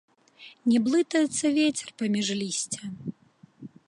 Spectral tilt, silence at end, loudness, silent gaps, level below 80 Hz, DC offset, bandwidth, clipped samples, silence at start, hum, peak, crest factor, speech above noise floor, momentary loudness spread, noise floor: -3.5 dB/octave; 0.2 s; -26 LUFS; none; -72 dBFS; under 0.1%; 11.5 kHz; under 0.1%; 0.4 s; none; -12 dBFS; 16 dB; 32 dB; 12 LU; -57 dBFS